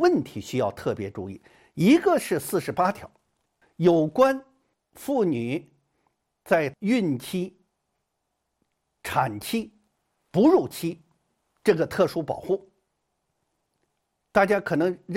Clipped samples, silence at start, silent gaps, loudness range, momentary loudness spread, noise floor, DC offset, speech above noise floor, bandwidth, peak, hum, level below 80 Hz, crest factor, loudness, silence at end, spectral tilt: under 0.1%; 0 s; none; 5 LU; 14 LU; -79 dBFS; under 0.1%; 55 dB; 16.5 kHz; -6 dBFS; none; -62 dBFS; 20 dB; -24 LUFS; 0 s; -6 dB/octave